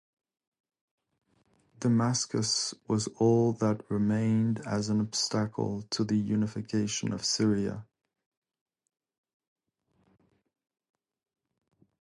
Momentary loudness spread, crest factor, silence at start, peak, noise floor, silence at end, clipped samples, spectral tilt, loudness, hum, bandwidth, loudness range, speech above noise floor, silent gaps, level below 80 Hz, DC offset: 6 LU; 18 dB; 1.8 s; -14 dBFS; -74 dBFS; 4.2 s; under 0.1%; -5 dB/octave; -29 LUFS; none; 11.5 kHz; 6 LU; 46 dB; none; -64 dBFS; under 0.1%